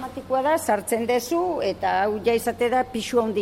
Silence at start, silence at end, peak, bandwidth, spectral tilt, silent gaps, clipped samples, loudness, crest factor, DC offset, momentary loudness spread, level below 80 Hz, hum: 0 s; 0 s; -10 dBFS; 16.5 kHz; -4 dB/octave; none; under 0.1%; -23 LUFS; 14 dB; under 0.1%; 3 LU; -54 dBFS; none